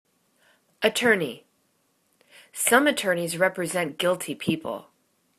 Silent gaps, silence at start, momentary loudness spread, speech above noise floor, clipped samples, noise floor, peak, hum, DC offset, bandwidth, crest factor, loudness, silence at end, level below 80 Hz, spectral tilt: none; 0.8 s; 15 LU; 45 dB; under 0.1%; -69 dBFS; -2 dBFS; none; under 0.1%; 14 kHz; 24 dB; -24 LUFS; 0.6 s; -70 dBFS; -3 dB/octave